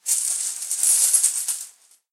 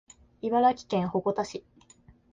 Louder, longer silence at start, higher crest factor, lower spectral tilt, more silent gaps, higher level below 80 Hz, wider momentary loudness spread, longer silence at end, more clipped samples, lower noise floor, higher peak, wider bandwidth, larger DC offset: first, -18 LUFS vs -28 LUFS; second, 0.05 s vs 0.45 s; about the same, 20 dB vs 16 dB; second, 6 dB/octave vs -6.5 dB/octave; neither; second, under -90 dBFS vs -62 dBFS; about the same, 13 LU vs 12 LU; second, 0.4 s vs 0.75 s; neither; second, -46 dBFS vs -58 dBFS; first, -2 dBFS vs -12 dBFS; first, 16.5 kHz vs 9.2 kHz; neither